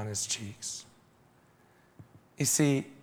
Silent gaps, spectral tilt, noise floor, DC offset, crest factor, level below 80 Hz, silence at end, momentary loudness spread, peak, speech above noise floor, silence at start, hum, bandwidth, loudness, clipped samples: none; -4 dB/octave; -63 dBFS; under 0.1%; 20 dB; -72 dBFS; 0 s; 13 LU; -14 dBFS; 32 dB; 0 s; none; over 20 kHz; -30 LUFS; under 0.1%